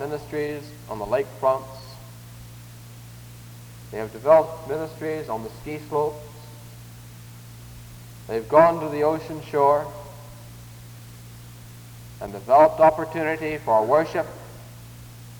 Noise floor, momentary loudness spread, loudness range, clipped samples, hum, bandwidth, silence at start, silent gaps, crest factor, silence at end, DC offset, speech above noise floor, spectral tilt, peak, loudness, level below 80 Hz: -42 dBFS; 25 LU; 9 LU; under 0.1%; none; over 20 kHz; 0 s; none; 22 dB; 0 s; under 0.1%; 20 dB; -6.5 dB/octave; -4 dBFS; -22 LUFS; -52 dBFS